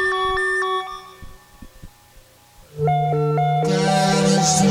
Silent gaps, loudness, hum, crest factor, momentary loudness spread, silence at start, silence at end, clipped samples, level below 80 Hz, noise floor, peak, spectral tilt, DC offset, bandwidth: none; -19 LUFS; none; 16 dB; 11 LU; 0 s; 0 s; under 0.1%; -46 dBFS; -49 dBFS; -4 dBFS; -4.5 dB/octave; under 0.1%; 15 kHz